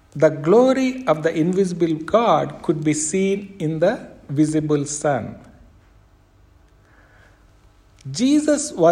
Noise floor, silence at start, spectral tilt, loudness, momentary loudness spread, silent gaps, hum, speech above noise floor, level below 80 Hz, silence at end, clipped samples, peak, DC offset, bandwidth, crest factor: -53 dBFS; 0.15 s; -5.5 dB/octave; -19 LUFS; 10 LU; none; 50 Hz at -45 dBFS; 34 dB; -54 dBFS; 0 s; under 0.1%; -2 dBFS; under 0.1%; 11.5 kHz; 18 dB